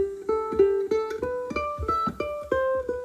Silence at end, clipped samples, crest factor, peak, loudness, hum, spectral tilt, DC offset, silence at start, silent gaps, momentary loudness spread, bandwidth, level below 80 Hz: 0 s; under 0.1%; 18 dB; -8 dBFS; -26 LUFS; none; -6.5 dB/octave; under 0.1%; 0 s; none; 7 LU; 14.5 kHz; -46 dBFS